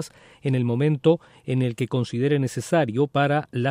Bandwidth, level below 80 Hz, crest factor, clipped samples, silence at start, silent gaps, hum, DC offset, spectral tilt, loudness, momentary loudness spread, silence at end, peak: 15 kHz; -64 dBFS; 16 dB; under 0.1%; 0 s; none; none; under 0.1%; -7 dB/octave; -23 LUFS; 5 LU; 0 s; -6 dBFS